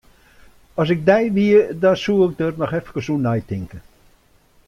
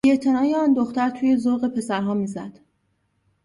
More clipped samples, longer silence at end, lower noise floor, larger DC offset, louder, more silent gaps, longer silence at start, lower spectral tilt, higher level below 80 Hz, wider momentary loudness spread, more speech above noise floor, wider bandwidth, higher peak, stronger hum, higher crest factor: neither; about the same, 0.85 s vs 0.95 s; second, -55 dBFS vs -69 dBFS; neither; first, -18 LUFS vs -21 LUFS; neither; first, 0.75 s vs 0.05 s; about the same, -7.5 dB/octave vs -6.5 dB/octave; first, -50 dBFS vs -62 dBFS; first, 14 LU vs 9 LU; second, 37 dB vs 49 dB; about the same, 11.5 kHz vs 11.5 kHz; first, -2 dBFS vs -8 dBFS; neither; about the same, 18 dB vs 14 dB